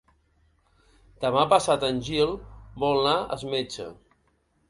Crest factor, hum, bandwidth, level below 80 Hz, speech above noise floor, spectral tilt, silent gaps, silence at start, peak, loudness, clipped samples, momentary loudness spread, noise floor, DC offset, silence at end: 24 dB; none; 11.5 kHz; -52 dBFS; 44 dB; -4.5 dB/octave; none; 1.2 s; -4 dBFS; -25 LUFS; under 0.1%; 17 LU; -68 dBFS; under 0.1%; 0.75 s